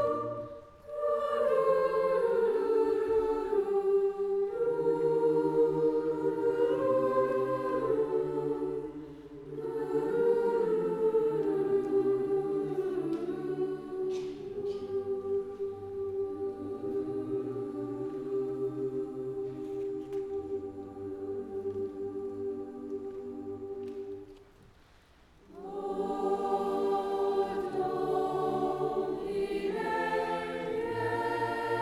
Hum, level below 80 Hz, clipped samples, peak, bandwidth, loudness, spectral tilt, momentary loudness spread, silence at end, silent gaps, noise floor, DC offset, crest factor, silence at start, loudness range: none; -62 dBFS; under 0.1%; -16 dBFS; 12 kHz; -32 LUFS; -7 dB/octave; 12 LU; 0 s; none; -60 dBFS; under 0.1%; 16 dB; 0 s; 10 LU